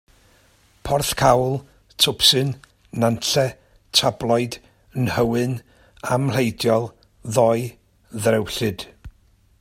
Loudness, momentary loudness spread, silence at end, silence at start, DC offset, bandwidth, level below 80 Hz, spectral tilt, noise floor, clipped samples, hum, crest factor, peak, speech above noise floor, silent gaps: -20 LUFS; 17 LU; 0.5 s; 0.85 s; under 0.1%; 16 kHz; -48 dBFS; -4 dB/octave; -57 dBFS; under 0.1%; none; 22 dB; 0 dBFS; 37 dB; none